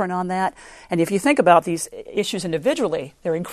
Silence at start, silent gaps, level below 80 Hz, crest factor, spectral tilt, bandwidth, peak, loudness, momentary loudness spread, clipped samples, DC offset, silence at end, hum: 0 s; none; -56 dBFS; 20 dB; -5 dB/octave; 13.5 kHz; 0 dBFS; -21 LUFS; 11 LU; under 0.1%; under 0.1%; 0 s; none